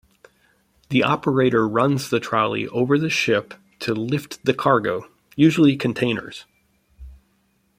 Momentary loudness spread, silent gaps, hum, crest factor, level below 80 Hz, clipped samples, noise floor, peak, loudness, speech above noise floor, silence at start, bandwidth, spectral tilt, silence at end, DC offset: 10 LU; none; none; 20 dB; -54 dBFS; under 0.1%; -65 dBFS; -2 dBFS; -20 LUFS; 45 dB; 0.9 s; 16 kHz; -6 dB/octave; 0.65 s; under 0.1%